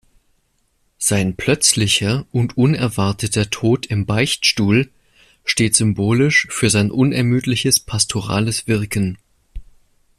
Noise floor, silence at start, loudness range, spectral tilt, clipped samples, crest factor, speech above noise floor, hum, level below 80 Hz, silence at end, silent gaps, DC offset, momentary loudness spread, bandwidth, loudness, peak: -64 dBFS; 1 s; 2 LU; -4 dB/octave; under 0.1%; 18 dB; 47 dB; none; -44 dBFS; 0.55 s; none; under 0.1%; 6 LU; 14.5 kHz; -17 LUFS; 0 dBFS